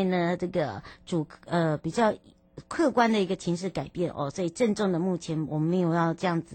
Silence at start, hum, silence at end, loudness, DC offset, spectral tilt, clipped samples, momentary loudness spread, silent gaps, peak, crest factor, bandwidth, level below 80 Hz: 0 s; none; 0 s; -28 LUFS; under 0.1%; -6.5 dB/octave; under 0.1%; 8 LU; none; -10 dBFS; 18 dB; 9 kHz; -60 dBFS